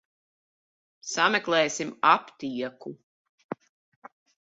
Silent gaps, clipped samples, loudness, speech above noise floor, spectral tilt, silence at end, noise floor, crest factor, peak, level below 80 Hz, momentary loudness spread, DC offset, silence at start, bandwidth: 3.03-3.38 s, 3.44-3.49 s; under 0.1%; -25 LUFS; over 64 dB; -2.5 dB/octave; 0.85 s; under -90 dBFS; 24 dB; -6 dBFS; -76 dBFS; 19 LU; under 0.1%; 1.05 s; 8.2 kHz